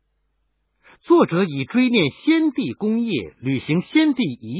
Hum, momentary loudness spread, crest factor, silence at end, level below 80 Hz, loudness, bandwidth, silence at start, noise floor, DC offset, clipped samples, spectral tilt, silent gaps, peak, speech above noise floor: none; 8 LU; 16 dB; 0 s; -60 dBFS; -20 LUFS; 4 kHz; 1.1 s; -70 dBFS; under 0.1%; under 0.1%; -10.5 dB/octave; none; -4 dBFS; 50 dB